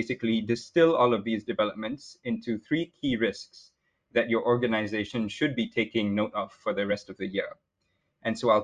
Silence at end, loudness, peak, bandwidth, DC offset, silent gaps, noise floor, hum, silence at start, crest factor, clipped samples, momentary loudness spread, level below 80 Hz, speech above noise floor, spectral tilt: 0 s; -28 LUFS; -10 dBFS; 9.8 kHz; under 0.1%; none; -76 dBFS; none; 0 s; 18 dB; under 0.1%; 10 LU; -62 dBFS; 49 dB; -6 dB/octave